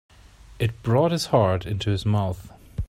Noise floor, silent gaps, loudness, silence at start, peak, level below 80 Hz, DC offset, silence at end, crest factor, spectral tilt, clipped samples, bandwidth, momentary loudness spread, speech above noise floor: -48 dBFS; none; -23 LUFS; 0.5 s; -6 dBFS; -42 dBFS; under 0.1%; 0.05 s; 18 dB; -6.5 dB/octave; under 0.1%; 14.5 kHz; 9 LU; 26 dB